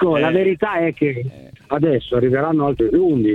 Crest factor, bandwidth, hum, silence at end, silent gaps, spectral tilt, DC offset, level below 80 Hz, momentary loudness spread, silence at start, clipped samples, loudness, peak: 12 dB; 4.4 kHz; none; 0 s; none; -9 dB/octave; under 0.1%; -44 dBFS; 6 LU; 0 s; under 0.1%; -18 LUFS; -4 dBFS